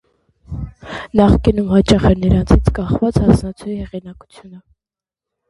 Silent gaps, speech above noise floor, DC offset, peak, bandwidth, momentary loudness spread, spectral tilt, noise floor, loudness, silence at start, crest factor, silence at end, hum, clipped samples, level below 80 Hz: none; 75 dB; under 0.1%; 0 dBFS; 11.5 kHz; 17 LU; -7.5 dB/octave; -89 dBFS; -15 LUFS; 0.5 s; 16 dB; 0.9 s; none; under 0.1%; -24 dBFS